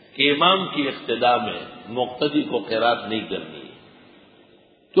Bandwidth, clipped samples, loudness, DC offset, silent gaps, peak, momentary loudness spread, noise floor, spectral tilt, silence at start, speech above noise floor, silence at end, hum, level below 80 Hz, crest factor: 5 kHz; under 0.1%; -22 LUFS; under 0.1%; none; -2 dBFS; 14 LU; -55 dBFS; -9 dB/octave; 0.15 s; 33 dB; 0 s; none; -64 dBFS; 20 dB